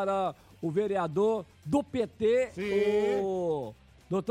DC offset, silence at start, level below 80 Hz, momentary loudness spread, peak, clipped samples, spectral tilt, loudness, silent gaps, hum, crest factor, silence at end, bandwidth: under 0.1%; 0 s; -62 dBFS; 8 LU; -16 dBFS; under 0.1%; -7 dB/octave; -30 LUFS; none; none; 14 dB; 0 s; 11 kHz